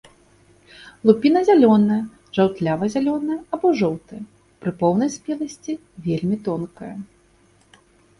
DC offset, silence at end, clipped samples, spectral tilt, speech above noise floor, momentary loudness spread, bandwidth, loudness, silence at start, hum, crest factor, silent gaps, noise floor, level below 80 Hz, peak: under 0.1%; 1.15 s; under 0.1%; -7 dB/octave; 37 dB; 17 LU; 11 kHz; -20 LUFS; 0.8 s; none; 20 dB; none; -57 dBFS; -58 dBFS; 0 dBFS